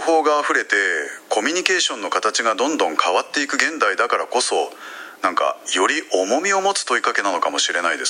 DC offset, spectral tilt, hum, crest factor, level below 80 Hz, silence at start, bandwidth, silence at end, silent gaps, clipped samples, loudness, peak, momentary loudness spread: under 0.1%; -0.5 dB/octave; none; 20 dB; -82 dBFS; 0 s; 16 kHz; 0 s; none; under 0.1%; -19 LUFS; 0 dBFS; 5 LU